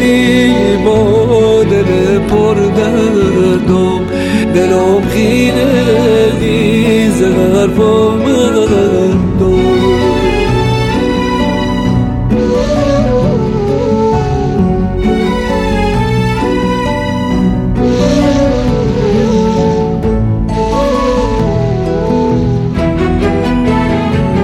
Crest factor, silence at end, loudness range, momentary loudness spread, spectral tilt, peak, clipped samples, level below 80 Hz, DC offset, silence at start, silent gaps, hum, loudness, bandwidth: 10 dB; 0 s; 3 LU; 4 LU; -7 dB/octave; 0 dBFS; under 0.1%; -24 dBFS; under 0.1%; 0 s; none; none; -11 LUFS; 15.5 kHz